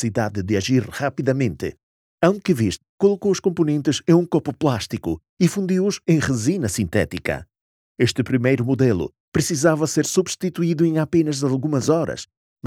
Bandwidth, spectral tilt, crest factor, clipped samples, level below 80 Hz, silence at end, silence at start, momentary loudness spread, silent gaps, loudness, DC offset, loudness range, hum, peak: 16 kHz; -5.5 dB/octave; 18 dB; under 0.1%; -50 dBFS; 0 s; 0 s; 7 LU; 1.83-2.18 s, 2.89-2.98 s, 5.29-5.37 s, 7.61-7.95 s, 9.20-9.32 s, 12.37-12.56 s; -21 LUFS; under 0.1%; 2 LU; none; -2 dBFS